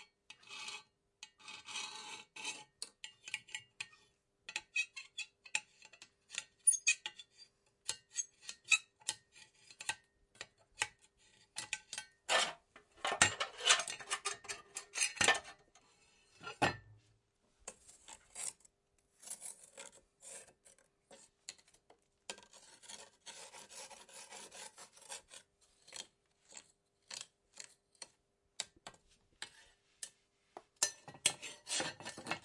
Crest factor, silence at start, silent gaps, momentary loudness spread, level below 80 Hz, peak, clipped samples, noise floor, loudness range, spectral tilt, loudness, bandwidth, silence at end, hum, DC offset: 32 dB; 0 s; none; 25 LU; -78 dBFS; -12 dBFS; under 0.1%; -78 dBFS; 18 LU; 0 dB/octave; -38 LUFS; 11.5 kHz; 0.05 s; none; under 0.1%